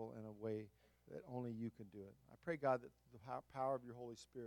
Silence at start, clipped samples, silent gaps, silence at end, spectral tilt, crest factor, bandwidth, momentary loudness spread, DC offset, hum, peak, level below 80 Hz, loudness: 0 s; under 0.1%; none; 0 s; -7.5 dB/octave; 22 dB; 17.5 kHz; 17 LU; under 0.1%; none; -26 dBFS; -80 dBFS; -47 LUFS